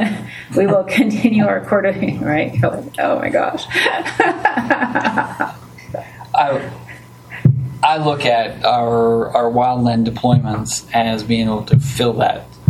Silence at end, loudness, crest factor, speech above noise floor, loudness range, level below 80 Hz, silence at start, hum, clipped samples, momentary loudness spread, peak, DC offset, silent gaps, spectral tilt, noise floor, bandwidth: 0.05 s; -16 LUFS; 16 dB; 21 dB; 3 LU; -46 dBFS; 0 s; none; under 0.1%; 9 LU; 0 dBFS; under 0.1%; none; -6 dB/octave; -37 dBFS; 14.5 kHz